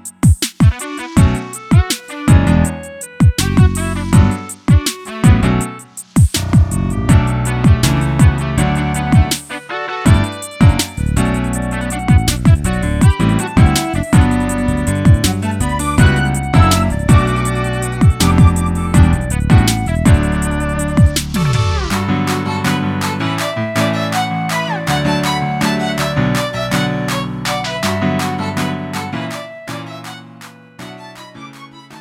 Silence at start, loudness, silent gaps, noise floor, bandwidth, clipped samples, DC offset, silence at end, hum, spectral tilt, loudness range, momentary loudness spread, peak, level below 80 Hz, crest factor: 0.05 s; -14 LUFS; none; -37 dBFS; 16.5 kHz; under 0.1%; under 0.1%; 0 s; none; -5.5 dB/octave; 5 LU; 10 LU; 0 dBFS; -22 dBFS; 14 dB